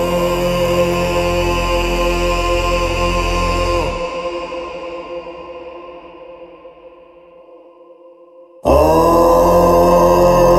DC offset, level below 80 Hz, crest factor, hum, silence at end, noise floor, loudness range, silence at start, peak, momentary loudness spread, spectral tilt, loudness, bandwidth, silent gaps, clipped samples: under 0.1%; -26 dBFS; 14 dB; none; 0 s; -43 dBFS; 19 LU; 0 s; 0 dBFS; 21 LU; -5.5 dB/octave; -14 LUFS; 15.5 kHz; none; under 0.1%